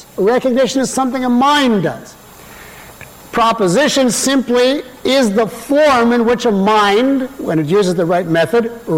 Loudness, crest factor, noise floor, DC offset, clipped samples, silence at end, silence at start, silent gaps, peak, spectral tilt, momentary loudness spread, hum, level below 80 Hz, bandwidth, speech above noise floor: -13 LUFS; 10 dB; -36 dBFS; 0.2%; under 0.1%; 0 s; 0.15 s; none; -4 dBFS; -4.5 dB/octave; 7 LU; none; -48 dBFS; 17 kHz; 23 dB